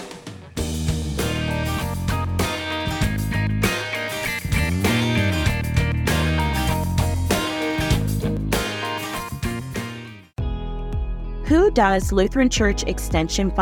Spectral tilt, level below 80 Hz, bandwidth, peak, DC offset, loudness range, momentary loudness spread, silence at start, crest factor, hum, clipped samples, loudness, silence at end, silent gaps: -5 dB/octave; -30 dBFS; 19 kHz; -4 dBFS; under 0.1%; 4 LU; 11 LU; 0 s; 18 dB; none; under 0.1%; -22 LUFS; 0 s; none